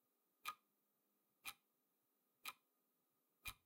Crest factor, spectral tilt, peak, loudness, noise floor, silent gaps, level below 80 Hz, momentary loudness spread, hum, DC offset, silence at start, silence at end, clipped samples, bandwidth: 28 dB; 0 dB/octave; -32 dBFS; -56 LUFS; -87 dBFS; none; -80 dBFS; 12 LU; none; under 0.1%; 0.45 s; 0.1 s; under 0.1%; 16.5 kHz